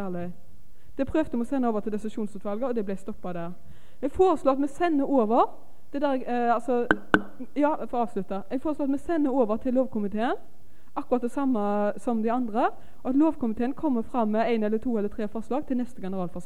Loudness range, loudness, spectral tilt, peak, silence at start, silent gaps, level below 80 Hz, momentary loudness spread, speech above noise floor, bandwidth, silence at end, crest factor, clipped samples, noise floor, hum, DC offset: 4 LU; -27 LUFS; -7 dB/octave; -2 dBFS; 0 s; none; -52 dBFS; 11 LU; 27 dB; 12 kHz; 0.05 s; 24 dB; under 0.1%; -53 dBFS; none; 2%